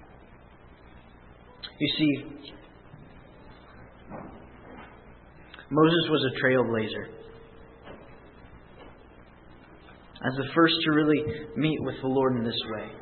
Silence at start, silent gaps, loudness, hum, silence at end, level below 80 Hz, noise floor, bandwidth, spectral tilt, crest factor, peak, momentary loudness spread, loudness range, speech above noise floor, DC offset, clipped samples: 0.3 s; none; -26 LUFS; none; 0 s; -56 dBFS; -52 dBFS; 4.4 kHz; -10 dB/octave; 22 dB; -8 dBFS; 26 LU; 15 LU; 26 dB; under 0.1%; under 0.1%